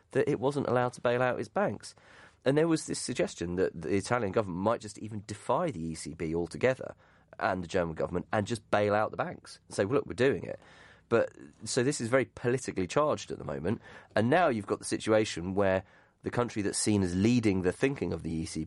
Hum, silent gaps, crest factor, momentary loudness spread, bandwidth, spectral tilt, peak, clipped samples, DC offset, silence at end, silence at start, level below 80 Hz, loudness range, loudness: none; none; 20 dB; 11 LU; 11.5 kHz; -5.5 dB/octave; -12 dBFS; under 0.1%; under 0.1%; 0 s; 0.15 s; -60 dBFS; 3 LU; -30 LUFS